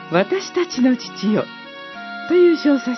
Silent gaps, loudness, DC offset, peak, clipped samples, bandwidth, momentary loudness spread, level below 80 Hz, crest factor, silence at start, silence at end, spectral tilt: none; -18 LUFS; under 0.1%; -2 dBFS; under 0.1%; 6.2 kHz; 18 LU; -68 dBFS; 16 dB; 0 s; 0 s; -5.5 dB/octave